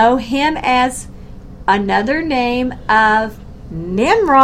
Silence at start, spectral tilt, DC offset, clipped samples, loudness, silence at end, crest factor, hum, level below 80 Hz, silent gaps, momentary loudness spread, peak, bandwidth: 0 s; -4.5 dB/octave; under 0.1%; under 0.1%; -15 LUFS; 0 s; 14 dB; none; -36 dBFS; none; 16 LU; 0 dBFS; 15 kHz